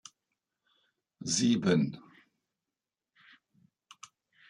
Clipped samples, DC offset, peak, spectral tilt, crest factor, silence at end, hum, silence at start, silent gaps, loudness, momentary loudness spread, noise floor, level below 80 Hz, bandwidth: under 0.1%; under 0.1%; -14 dBFS; -4.5 dB/octave; 22 dB; 2.5 s; none; 1.2 s; none; -29 LUFS; 26 LU; under -90 dBFS; -74 dBFS; 11.5 kHz